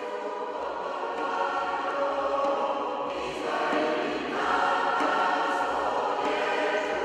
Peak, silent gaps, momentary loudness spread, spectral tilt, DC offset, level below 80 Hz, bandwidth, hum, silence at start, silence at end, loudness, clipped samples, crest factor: -12 dBFS; none; 7 LU; -3.5 dB/octave; under 0.1%; -64 dBFS; 12 kHz; none; 0 s; 0 s; -28 LUFS; under 0.1%; 16 dB